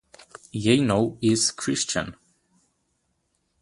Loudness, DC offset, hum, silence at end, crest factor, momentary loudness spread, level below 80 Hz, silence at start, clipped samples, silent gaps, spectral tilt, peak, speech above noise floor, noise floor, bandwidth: -23 LUFS; under 0.1%; none; 1.5 s; 20 dB; 10 LU; -56 dBFS; 0.55 s; under 0.1%; none; -4 dB/octave; -6 dBFS; 50 dB; -73 dBFS; 11.5 kHz